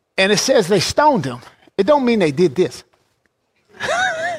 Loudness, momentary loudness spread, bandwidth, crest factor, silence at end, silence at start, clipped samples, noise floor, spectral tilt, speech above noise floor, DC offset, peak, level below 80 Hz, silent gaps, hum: -16 LUFS; 14 LU; 16 kHz; 16 dB; 0 s; 0.15 s; under 0.1%; -66 dBFS; -4 dB/octave; 50 dB; under 0.1%; -2 dBFS; -52 dBFS; none; none